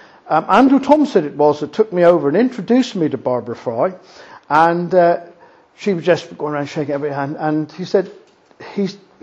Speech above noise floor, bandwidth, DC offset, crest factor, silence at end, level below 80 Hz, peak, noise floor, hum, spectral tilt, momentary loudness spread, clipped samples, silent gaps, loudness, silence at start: 31 dB; 8 kHz; under 0.1%; 16 dB; 0.25 s; -62 dBFS; 0 dBFS; -46 dBFS; none; -7 dB/octave; 11 LU; under 0.1%; none; -16 LUFS; 0.25 s